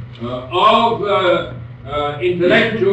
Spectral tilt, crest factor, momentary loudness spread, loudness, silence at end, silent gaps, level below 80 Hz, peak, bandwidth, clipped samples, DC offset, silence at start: -6.5 dB/octave; 12 dB; 14 LU; -15 LUFS; 0 s; none; -44 dBFS; -2 dBFS; 8.4 kHz; under 0.1%; under 0.1%; 0 s